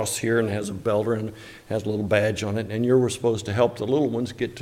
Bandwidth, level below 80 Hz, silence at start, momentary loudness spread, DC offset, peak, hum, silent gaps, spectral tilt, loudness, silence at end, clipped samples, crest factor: 16.5 kHz; -58 dBFS; 0 s; 8 LU; under 0.1%; -6 dBFS; none; none; -5.5 dB/octave; -24 LUFS; 0 s; under 0.1%; 18 dB